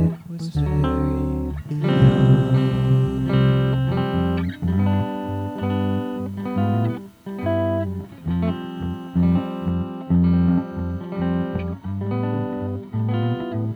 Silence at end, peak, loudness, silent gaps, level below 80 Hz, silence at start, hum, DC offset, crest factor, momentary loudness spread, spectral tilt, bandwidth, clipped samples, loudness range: 0 s; -4 dBFS; -22 LUFS; none; -36 dBFS; 0 s; none; under 0.1%; 16 dB; 11 LU; -9.5 dB/octave; 5.4 kHz; under 0.1%; 6 LU